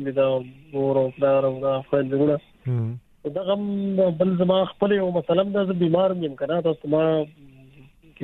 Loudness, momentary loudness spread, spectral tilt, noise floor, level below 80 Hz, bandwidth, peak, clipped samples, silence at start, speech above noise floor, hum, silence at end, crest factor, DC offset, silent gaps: -23 LUFS; 8 LU; -10 dB/octave; -50 dBFS; -60 dBFS; 4.1 kHz; -6 dBFS; under 0.1%; 0 s; 28 dB; none; 0 s; 18 dB; under 0.1%; none